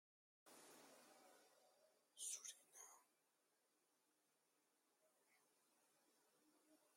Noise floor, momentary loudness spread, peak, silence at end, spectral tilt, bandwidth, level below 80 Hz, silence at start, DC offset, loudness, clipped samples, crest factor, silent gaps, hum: -86 dBFS; 17 LU; -38 dBFS; 0 s; 1.5 dB/octave; 16.5 kHz; under -90 dBFS; 0.45 s; under 0.1%; -56 LUFS; under 0.1%; 28 dB; none; none